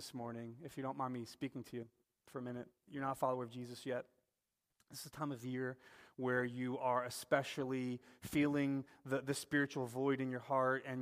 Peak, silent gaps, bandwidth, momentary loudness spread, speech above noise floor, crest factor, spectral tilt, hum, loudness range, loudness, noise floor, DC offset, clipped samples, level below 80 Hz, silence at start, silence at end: -18 dBFS; none; 15.5 kHz; 14 LU; 49 dB; 22 dB; -5.5 dB/octave; none; 7 LU; -41 LUFS; -89 dBFS; under 0.1%; under 0.1%; -78 dBFS; 0 s; 0 s